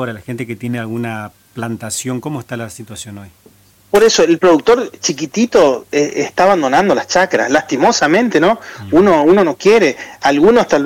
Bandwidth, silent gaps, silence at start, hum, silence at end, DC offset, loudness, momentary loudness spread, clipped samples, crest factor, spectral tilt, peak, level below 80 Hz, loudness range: 16.5 kHz; none; 0 s; none; 0 s; under 0.1%; -13 LUFS; 15 LU; under 0.1%; 10 dB; -4.5 dB/octave; -2 dBFS; -48 dBFS; 11 LU